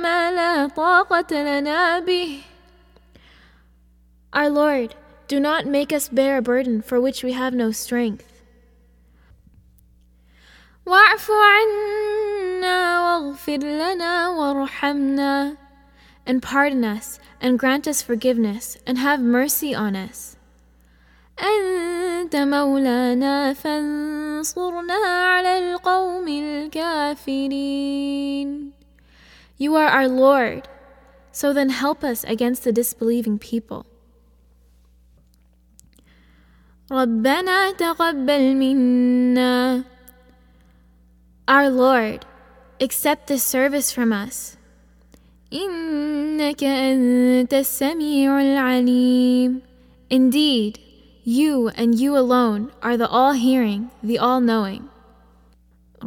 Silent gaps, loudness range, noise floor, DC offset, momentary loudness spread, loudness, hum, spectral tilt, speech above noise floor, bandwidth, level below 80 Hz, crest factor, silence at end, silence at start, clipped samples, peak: none; 7 LU; -55 dBFS; under 0.1%; 10 LU; -19 LUFS; none; -3.5 dB/octave; 36 dB; 18.5 kHz; -54 dBFS; 20 dB; 0 s; 0 s; under 0.1%; 0 dBFS